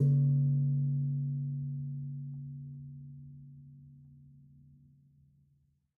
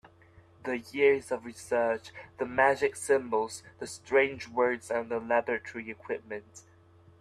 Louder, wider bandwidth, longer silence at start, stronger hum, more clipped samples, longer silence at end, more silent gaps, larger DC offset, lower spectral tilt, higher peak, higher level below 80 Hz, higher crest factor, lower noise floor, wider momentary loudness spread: second, -33 LUFS vs -30 LUFS; second, 0.6 kHz vs 13 kHz; second, 0 s vs 0.65 s; neither; neither; first, 1.75 s vs 0.6 s; neither; neither; first, -16 dB/octave vs -4 dB/octave; second, -20 dBFS vs -10 dBFS; about the same, -70 dBFS vs -68 dBFS; about the same, 16 dB vs 20 dB; first, -72 dBFS vs -58 dBFS; first, 25 LU vs 16 LU